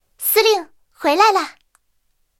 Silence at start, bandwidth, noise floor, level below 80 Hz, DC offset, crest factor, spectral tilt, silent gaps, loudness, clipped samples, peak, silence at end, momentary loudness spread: 0.2 s; 17 kHz; -66 dBFS; -66 dBFS; under 0.1%; 18 dB; 0.5 dB/octave; none; -16 LUFS; under 0.1%; -2 dBFS; 0.9 s; 9 LU